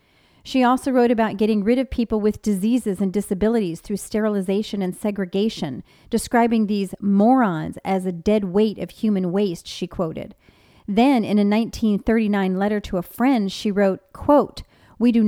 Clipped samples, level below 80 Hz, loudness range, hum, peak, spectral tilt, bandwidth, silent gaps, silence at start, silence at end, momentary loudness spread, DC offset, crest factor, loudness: under 0.1%; -46 dBFS; 3 LU; none; -4 dBFS; -6.5 dB/octave; 16 kHz; none; 0.45 s; 0 s; 9 LU; under 0.1%; 16 dB; -21 LUFS